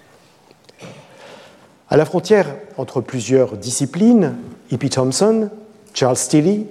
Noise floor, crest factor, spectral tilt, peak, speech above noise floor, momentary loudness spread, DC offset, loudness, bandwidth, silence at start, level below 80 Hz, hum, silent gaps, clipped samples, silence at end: -50 dBFS; 16 dB; -5.5 dB/octave; -2 dBFS; 34 dB; 11 LU; under 0.1%; -17 LUFS; 13.5 kHz; 0.8 s; -58 dBFS; none; none; under 0.1%; 0 s